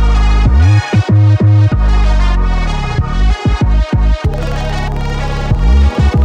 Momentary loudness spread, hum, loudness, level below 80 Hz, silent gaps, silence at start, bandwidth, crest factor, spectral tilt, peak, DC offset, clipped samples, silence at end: 9 LU; none; -13 LUFS; -12 dBFS; none; 0 s; 8.4 kHz; 10 dB; -7 dB/octave; 0 dBFS; under 0.1%; under 0.1%; 0 s